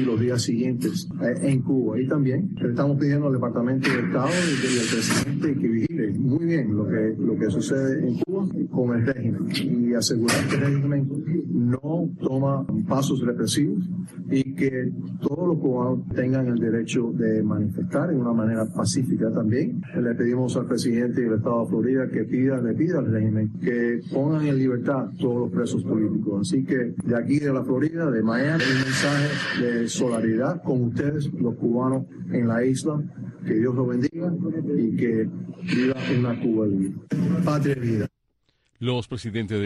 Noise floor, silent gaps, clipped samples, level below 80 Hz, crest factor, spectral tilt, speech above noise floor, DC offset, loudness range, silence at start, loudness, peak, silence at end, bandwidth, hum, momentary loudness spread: -70 dBFS; none; under 0.1%; -58 dBFS; 14 dB; -6 dB/octave; 48 dB; under 0.1%; 2 LU; 0 s; -24 LUFS; -10 dBFS; 0 s; 12.5 kHz; none; 4 LU